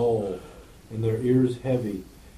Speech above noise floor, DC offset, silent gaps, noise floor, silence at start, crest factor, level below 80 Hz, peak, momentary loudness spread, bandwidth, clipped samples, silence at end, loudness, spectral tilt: 22 dB; under 0.1%; none; -46 dBFS; 0 s; 14 dB; -52 dBFS; -12 dBFS; 16 LU; 14.5 kHz; under 0.1%; 0 s; -26 LUFS; -8.5 dB/octave